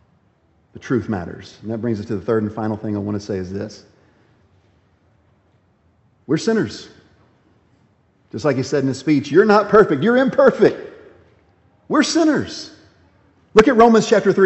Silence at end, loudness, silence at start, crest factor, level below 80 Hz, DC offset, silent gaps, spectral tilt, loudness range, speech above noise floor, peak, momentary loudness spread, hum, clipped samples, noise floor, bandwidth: 0 s; -17 LUFS; 0.75 s; 18 dB; -54 dBFS; under 0.1%; none; -6 dB/octave; 12 LU; 43 dB; 0 dBFS; 20 LU; none; under 0.1%; -59 dBFS; 8.2 kHz